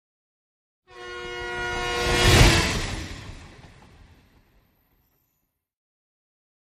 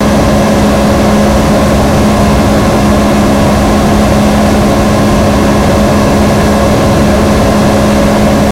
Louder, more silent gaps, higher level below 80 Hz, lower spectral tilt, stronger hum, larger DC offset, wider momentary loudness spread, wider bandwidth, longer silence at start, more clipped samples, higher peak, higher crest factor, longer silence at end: second, -21 LUFS vs -8 LUFS; neither; second, -32 dBFS vs -18 dBFS; second, -4 dB/octave vs -6 dB/octave; neither; neither; first, 23 LU vs 0 LU; second, 15 kHz vs 17 kHz; first, 0.95 s vs 0 s; second, under 0.1% vs 0.3%; about the same, -2 dBFS vs 0 dBFS; first, 26 dB vs 6 dB; first, 3.25 s vs 0 s